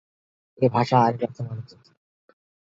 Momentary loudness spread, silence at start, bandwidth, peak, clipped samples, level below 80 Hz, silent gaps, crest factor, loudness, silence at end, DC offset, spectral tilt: 15 LU; 0.6 s; 7.6 kHz; -4 dBFS; under 0.1%; -64 dBFS; none; 22 dB; -23 LUFS; 1.2 s; under 0.1%; -8 dB/octave